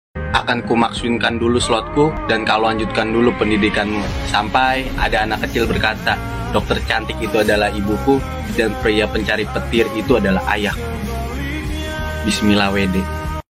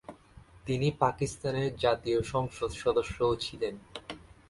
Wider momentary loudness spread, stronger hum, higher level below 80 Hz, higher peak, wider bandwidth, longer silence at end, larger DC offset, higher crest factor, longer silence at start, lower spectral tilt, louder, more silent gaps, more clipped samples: second, 8 LU vs 15 LU; neither; first, -30 dBFS vs -52 dBFS; first, -2 dBFS vs -10 dBFS; first, 16 kHz vs 11.5 kHz; second, 0.1 s vs 0.3 s; neither; second, 16 dB vs 22 dB; about the same, 0.15 s vs 0.1 s; about the same, -5 dB/octave vs -5.5 dB/octave; first, -18 LUFS vs -31 LUFS; neither; neither